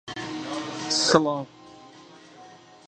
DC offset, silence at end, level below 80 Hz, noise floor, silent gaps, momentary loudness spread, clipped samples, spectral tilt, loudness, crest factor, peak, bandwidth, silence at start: under 0.1%; 0.15 s; -62 dBFS; -49 dBFS; none; 14 LU; under 0.1%; -3 dB/octave; -24 LUFS; 26 dB; -2 dBFS; 11 kHz; 0.05 s